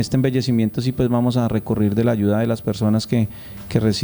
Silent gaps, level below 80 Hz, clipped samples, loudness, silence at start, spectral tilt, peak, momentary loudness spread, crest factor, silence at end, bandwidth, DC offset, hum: none; -44 dBFS; under 0.1%; -20 LUFS; 0 s; -7 dB/octave; -4 dBFS; 4 LU; 16 dB; 0 s; over 20 kHz; under 0.1%; none